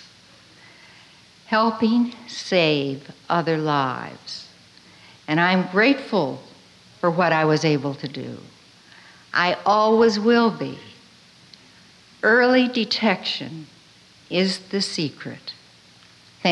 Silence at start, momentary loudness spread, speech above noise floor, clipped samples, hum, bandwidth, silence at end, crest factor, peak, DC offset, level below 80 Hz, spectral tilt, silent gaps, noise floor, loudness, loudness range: 1.5 s; 18 LU; 31 dB; under 0.1%; none; 11 kHz; 0 s; 16 dB; -6 dBFS; under 0.1%; -68 dBFS; -5.5 dB/octave; none; -51 dBFS; -21 LUFS; 4 LU